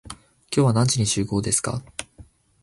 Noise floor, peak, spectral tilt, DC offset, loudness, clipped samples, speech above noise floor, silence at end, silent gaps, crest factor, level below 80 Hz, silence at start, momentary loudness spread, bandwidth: -50 dBFS; -6 dBFS; -4.5 dB/octave; under 0.1%; -22 LUFS; under 0.1%; 29 dB; 0.4 s; none; 18 dB; -48 dBFS; 0.05 s; 17 LU; 11.5 kHz